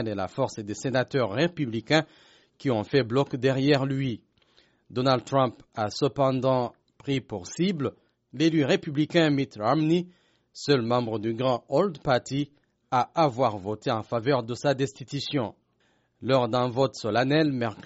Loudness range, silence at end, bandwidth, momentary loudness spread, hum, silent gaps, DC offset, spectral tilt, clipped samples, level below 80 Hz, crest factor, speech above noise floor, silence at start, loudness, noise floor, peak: 2 LU; 0.05 s; 8 kHz; 9 LU; none; none; under 0.1%; -5 dB/octave; under 0.1%; -62 dBFS; 20 dB; 43 dB; 0 s; -26 LUFS; -68 dBFS; -6 dBFS